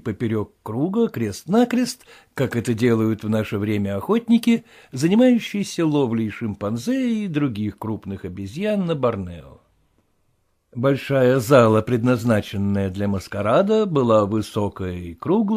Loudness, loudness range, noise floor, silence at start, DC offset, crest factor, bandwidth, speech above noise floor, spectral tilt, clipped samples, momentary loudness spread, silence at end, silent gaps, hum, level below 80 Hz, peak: -21 LUFS; 6 LU; -66 dBFS; 0.05 s; under 0.1%; 18 dB; 15.5 kHz; 46 dB; -7 dB/octave; under 0.1%; 12 LU; 0 s; none; none; -54 dBFS; -2 dBFS